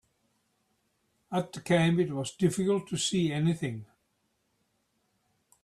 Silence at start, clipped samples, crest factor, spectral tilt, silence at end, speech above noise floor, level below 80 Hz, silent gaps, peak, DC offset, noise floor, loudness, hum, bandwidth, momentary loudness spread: 1.3 s; under 0.1%; 20 dB; -5.5 dB/octave; 1.8 s; 48 dB; -66 dBFS; none; -12 dBFS; under 0.1%; -76 dBFS; -29 LUFS; none; 13 kHz; 9 LU